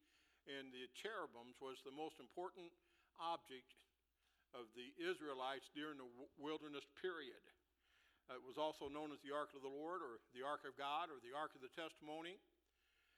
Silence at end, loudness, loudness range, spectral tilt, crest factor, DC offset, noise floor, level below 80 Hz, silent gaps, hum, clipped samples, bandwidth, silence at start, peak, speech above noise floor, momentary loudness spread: 0.8 s; -51 LUFS; 5 LU; -4 dB/octave; 20 dB; under 0.1%; -85 dBFS; -88 dBFS; none; none; under 0.1%; 14 kHz; 0.45 s; -32 dBFS; 34 dB; 12 LU